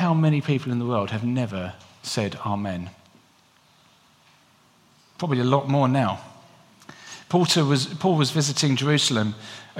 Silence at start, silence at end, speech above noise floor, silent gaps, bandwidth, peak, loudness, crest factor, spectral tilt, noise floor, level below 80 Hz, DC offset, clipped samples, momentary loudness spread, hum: 0 s; 0 s; 36 dB; none; 15.5 kHz; -4 dBFS; -23 LUFS; 20 dB; -5 dB/octave; -58 dBFS; -66 dBFS; under 0.1%; under 0.1%; 16 LU; none